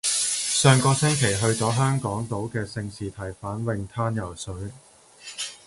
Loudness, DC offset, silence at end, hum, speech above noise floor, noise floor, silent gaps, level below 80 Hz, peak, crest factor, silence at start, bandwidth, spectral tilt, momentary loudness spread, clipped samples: -24 LUFS; under 0.1%; 0.1 s; none; 21 dB; -45 dBFS; none; -50 dBFS; -4 dBFS; 20 dB; 0.05 s; 11.5 kHz; -4 dB/octave; 16 LU; under 0.1%